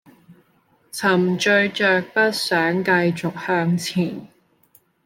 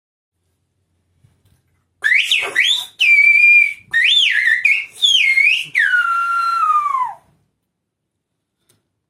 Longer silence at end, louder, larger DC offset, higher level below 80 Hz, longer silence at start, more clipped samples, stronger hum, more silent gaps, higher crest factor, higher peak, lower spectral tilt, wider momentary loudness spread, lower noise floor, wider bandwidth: second, 0.8 s vs 1.95 s; second, -19 LUFS vs -12 LUFS; neither; about the same, -66 dBFS vs -70 dBFS; second, 0.3 s vs 2 s; neither; neither; neither; about the same, 18 dB vs 14 dB; about the same, -4 dBFS vs -2 dBFS; first, -5 dB/octave vs 2.5 dB/octave; about the same, 8 LU vs 9 LU; second, -60 dBFS vs -75 dBFS; about the same, 16.5 kHz vs 15.5 kHz